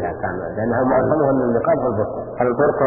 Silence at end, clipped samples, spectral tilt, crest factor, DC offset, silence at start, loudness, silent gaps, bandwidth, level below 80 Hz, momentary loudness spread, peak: 0 s; under 0.1%; -15 dB/octave; 16 dB; under 0.1%; 0 s; -19 LUFS; none; 2.7 kHz; -46 dBFS; 8 LU; -2 dBFS